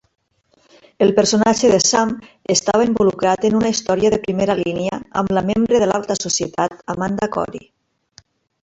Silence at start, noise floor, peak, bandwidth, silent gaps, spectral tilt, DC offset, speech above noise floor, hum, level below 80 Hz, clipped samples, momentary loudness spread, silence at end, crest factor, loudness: 1 s; -60 dBFS; 0 dBFS; 8.2 kHz; none; -4 dB/octave; under 0.1%; 43 dB; none; -48 dBFS; under 0.1%; 9 LU; 1.05 s; 18 dB; -17 LUFS